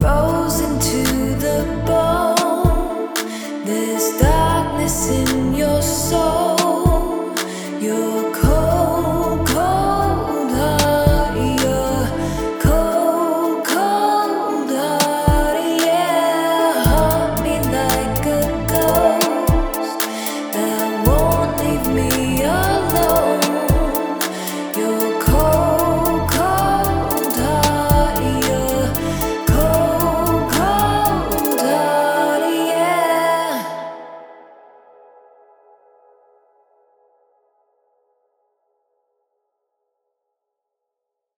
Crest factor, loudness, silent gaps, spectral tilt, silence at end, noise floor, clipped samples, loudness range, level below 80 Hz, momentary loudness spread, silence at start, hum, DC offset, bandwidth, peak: 18 dB; -17 LUFS; none; -5 dB/octave; 7 s; -81 dBFS; under 0.1%; 2 LU; -28 dBFS; 6 LU; 0 s; none; under 0.1%; over 20 kHz; 0 dBFS